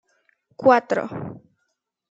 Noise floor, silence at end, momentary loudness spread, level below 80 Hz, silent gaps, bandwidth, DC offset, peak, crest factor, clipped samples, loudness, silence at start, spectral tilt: -76 dBFS; 0.75 s; 17 LU; -68 dBFS; none; 7.8 kHz; under 0.1%; -2 dBFS; 22 dB; under 0.1%; -20 LUFS; 0.6 s; -6.5 dB/octave